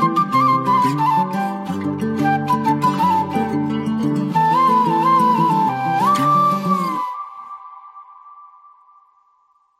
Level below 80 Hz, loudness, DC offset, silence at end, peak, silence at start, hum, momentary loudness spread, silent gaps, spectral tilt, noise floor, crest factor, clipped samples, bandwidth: -62 dBFS; -17 LUFS; under 0.1%; 1.35 s; -4 dBFS; 0 s; none; 10 LU; none; -6.5 dB/octave; -59 dBFS; 14 dB; under 0.1%; 15.5 kHz